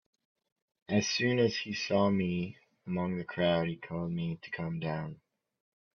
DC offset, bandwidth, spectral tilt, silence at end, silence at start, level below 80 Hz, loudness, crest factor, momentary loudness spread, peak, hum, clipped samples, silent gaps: under 0.1%; 7 kHz; -5.5 dB/octave; 0.8 s; 0.9 s; -68 dBFS; -32 LUFS; 20 dB; 10 LU; -14 dBFS; none; under 0.1%; none